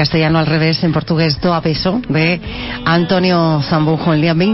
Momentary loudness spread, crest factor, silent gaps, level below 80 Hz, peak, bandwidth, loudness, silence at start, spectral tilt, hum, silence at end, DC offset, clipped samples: 3 LU; 10 dB; none; -36 dBFS; -2 dBFS; 6 kHz; -14 LUFS; 0 s; -9 dB/octave; none; 0 s; under 0.1%; under 0.1%